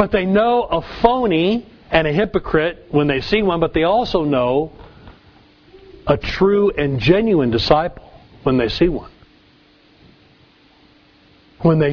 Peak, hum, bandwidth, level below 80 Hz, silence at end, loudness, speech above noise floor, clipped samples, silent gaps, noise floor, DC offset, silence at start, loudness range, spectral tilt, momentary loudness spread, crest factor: 0 dBFS; none; 5.4 kHz; -38 dBFS; 0 s; -17 LUFS; 35 dB; under 0.1%; none; -52 dBFS; under 0.1%; 0 s; 7 LU; -7.5 dB/octave; 5 LU; 18 dB